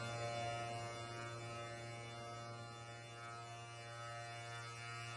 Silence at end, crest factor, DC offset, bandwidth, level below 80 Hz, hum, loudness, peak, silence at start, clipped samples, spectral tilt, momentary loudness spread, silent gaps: 0 s; 16 dB; under 0.1%; 11 kHz; -76 dBFS; none; -48 LUFS; -32 dBFS; 0 s; under 0.1%; -4 dB/octave; 8 LU; none